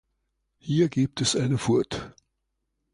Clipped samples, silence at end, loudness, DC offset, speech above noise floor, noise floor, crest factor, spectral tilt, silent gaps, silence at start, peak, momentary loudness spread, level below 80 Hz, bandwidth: under 0.1%; 0.85 s; -25 LUFS; under 0.1%; 55 dB; -79 dBFS; 16 dB; -5 dB/octave; none; 0.65 s; -12 dBFS; 14 LU; -56 dBFS; 11 kHz